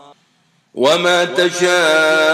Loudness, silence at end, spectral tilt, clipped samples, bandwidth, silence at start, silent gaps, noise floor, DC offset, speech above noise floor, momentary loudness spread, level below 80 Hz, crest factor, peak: -13 LUFS; 0 s; -2.5 dB/octave; under 0.1%; 16 kHz; 0.75 s; none; -58 dBFS; under 0.1%; 45 dB; 5 LU; -74 dBFS; 14 dB; -2 dBFS